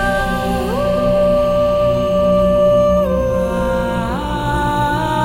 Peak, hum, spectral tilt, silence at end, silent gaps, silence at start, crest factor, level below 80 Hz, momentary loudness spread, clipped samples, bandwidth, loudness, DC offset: -4 dBFS; 60 Hz at -30 dBFS; -6.5 dB/octave; 0 s; none; 0 s; 10 dB; -28 dBFS; 6 LU; under 0.1%; 16.5 kHz; -16 LUFS; under 0.1%